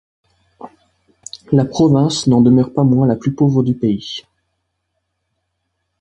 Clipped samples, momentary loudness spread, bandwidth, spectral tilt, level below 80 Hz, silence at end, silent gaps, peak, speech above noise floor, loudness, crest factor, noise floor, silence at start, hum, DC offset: under 0.1%; 16 LU; 9.2 kHz; -7.5 dB/octave; -50 dBFS; 1.8 s; none; 0 dBFS; 58 dB; -14 LUFS; 16 dB; -72 dBFS; 0.65 s; none; under 0.1%